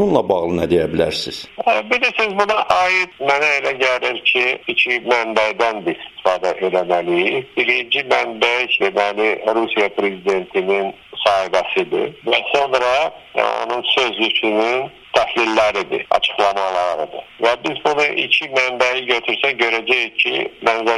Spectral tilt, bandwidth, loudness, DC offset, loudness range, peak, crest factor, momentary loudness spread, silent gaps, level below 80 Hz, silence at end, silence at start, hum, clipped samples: -3.5 dB/octave; 12.5 kHz; -17 LUFS; under 0.1%; 2 LU; 0 dBFS; 18 dB; 5 LU; none; -52 dBFS; 0 s; 0 s; none; under 0.1%